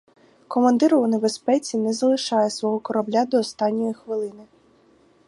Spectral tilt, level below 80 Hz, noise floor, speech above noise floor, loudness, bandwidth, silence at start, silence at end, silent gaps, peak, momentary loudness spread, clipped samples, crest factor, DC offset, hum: -5 dB/octave; -72 dBFS; -57 dBFS; 36 dB; -22 LUFS; 11.5 kHz; 0.5 s; 0.85 s; none; -6 dBFS; 10 LU; under 0.1%; 18 dB; under 0.1%; none